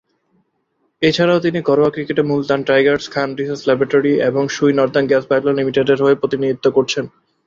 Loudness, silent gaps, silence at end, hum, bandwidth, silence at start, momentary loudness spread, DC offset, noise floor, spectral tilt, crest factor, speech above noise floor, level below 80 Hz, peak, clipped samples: -16 LUFS; none; 0.4 s; none; 7.6 kHz; 1 s; 6 LU; under 0.1%; -66 dBFS; -5.5 dB/octave; 14 dB; 51 dB; -56 dBFS; -2 dBFS; under 0.1%